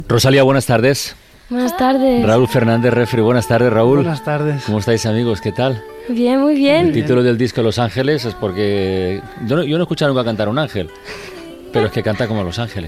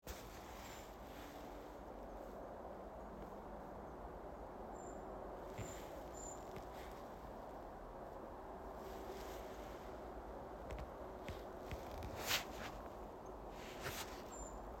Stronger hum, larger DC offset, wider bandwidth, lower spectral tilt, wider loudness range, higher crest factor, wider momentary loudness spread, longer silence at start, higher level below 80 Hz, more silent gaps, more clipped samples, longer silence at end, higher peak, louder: neither; neither; about the same, 15.5 kHz vs 16.5 kHz; first, -6 dB/octave vs -3.5 dB/octave; about the same, 5 LU vs 6 LU; second, 14 dB vs 26 dB; first, 10 LU vs 6 LU; about the same, 0 s vs 0.05 s; first, -44 dBFS vs -58 dBFS; neither; neither; about the same, 0 s vs 0 s; first, -2 dBFS vs -24 dBFS; first, -15 LUFS vs -50 LUFS